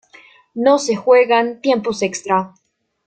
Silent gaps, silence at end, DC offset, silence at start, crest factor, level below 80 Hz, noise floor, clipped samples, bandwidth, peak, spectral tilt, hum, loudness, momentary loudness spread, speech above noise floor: none; 0.6 s; under 0.1%; 0.55 s; 16 dB; -62 dBFS; -47 dBFS; under 0.1%; 9.2 kHz; -2 dBFS; -4 dB/octave; none; -16 LUFS; 9 LU; 32 dB